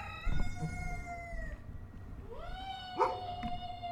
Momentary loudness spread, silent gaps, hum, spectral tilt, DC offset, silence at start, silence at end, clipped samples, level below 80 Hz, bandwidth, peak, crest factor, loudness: 15 LU; none; none; -5.5 dB/octave; under 0.1%; 0 s; 0 s; under 0.1%; -42 dBFS; 10 kHz; -16 dBFS; 22 dB; -40 LUFS